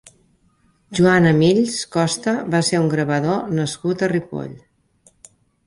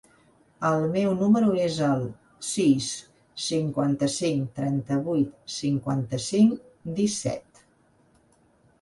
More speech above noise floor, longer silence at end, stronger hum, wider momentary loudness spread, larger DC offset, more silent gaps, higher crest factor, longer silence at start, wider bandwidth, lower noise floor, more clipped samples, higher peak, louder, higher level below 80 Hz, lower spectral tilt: first, 42 dB vs 38 dB; second, 1.1 s vs 1.4 s; neither; about the same, 11 LU vs 11 LU; neither; neither; about the same, 16 dB vs 18 dB; first, 0.9 s vs 0.6 s; about the same, 11.5 kHz vs 11.5 kHz; about the same, -60 dBFS vs -62 dBFS; neither; first, -4 dBFS vs -8 dBFS; first, -18 LUFS vs -25 LUFS; first, -54 dBFS vs -60 dBFS; about the same, -5.5 dB/octave vs -5.5 dB/octave